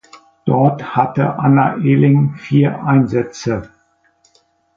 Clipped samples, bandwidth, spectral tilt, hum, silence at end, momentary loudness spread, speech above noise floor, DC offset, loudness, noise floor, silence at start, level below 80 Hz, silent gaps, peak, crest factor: under 0.1%; 7.4 kHz; -8.5 dB/octave; none; 1.1 s; 9 LU; 44 dB; under 0.1%; -15 LUFS; -58 dBFS; 0.45 s; -50 dBFS; none; 0 dBFS; 14 dB